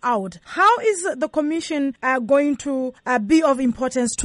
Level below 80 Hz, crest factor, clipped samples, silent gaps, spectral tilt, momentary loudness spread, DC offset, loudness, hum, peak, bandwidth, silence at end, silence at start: -54 dBFS; 14 dB; under 0.1%; none; -3.5 dB/octave; 8 LU; under 0.1%; -20 LUFS; none; -6 dBFS; 11.5 kHz; 0 s; 0.05 s